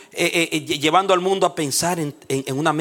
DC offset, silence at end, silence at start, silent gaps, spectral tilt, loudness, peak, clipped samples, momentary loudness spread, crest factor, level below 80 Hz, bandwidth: under 0.1%; 0 s; 0 s; none; -3.5 dB/octave; -20 LUFS; -2 dBFS; under 0.1%; 8 LU; 18 dB; -62 dBFS; 18 kHz